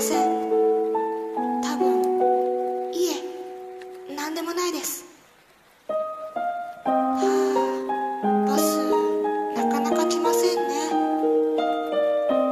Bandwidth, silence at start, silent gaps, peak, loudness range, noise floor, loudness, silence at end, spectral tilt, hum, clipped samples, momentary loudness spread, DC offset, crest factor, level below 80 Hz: 14 kHz; 0 s; none; -8 dBFS; 7 LU; -56 dBFS; -24 LUFS; 0 s; -4 dB/octave; none; under 0.1%; 10 LU; under 0.1%; 14 dB; -70 dBFS